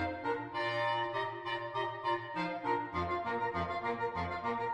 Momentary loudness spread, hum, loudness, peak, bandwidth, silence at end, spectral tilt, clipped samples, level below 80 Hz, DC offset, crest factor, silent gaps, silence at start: 4 LU; none; -36 LUFS; -20 dBFS; 10 kHz; 0 s; -6 dB/octave; under 0.1%; -62 dBFS; under 0.1%; 16 dB; none; 0 s